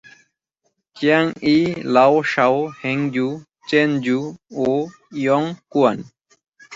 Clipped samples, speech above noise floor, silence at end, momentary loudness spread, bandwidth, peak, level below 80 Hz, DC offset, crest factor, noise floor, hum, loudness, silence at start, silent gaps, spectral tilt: under 0.1%; 53 dB; 0 s; 9 LU; 7.8 kHz; -2 dBFS; -62 dBFS; under 0.1%; 18 dB; -71 dBFS; none; -19 LUFS; 0.95 s; none; -6.5 dB/octave